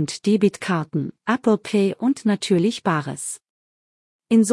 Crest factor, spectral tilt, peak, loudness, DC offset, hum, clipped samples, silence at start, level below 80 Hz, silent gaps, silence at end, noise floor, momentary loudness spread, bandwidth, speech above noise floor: 16 dB; -5.5 dB/octave; -6 dBFS; -21 LUFS; under 0.1%; none; under 0.1%; 0 s; -66 dBFS; 3.50-4.19 s; 0 s; under -90 dBFS; 9 LU; 12 kHz; over 69 dB